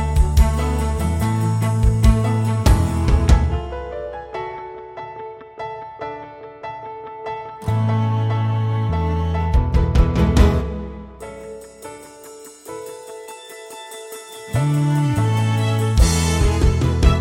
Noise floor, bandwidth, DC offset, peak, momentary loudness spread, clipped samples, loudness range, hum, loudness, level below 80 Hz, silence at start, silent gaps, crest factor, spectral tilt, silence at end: -40 dBFS; 16 kHz; under 0.1%; -2 dBFS; 19 LU; under 0.1%; 14 LU; none; -19 LUFS; -22 dBFS; 0 s; none; 18 dB; -6.5 dB/octave; 0 s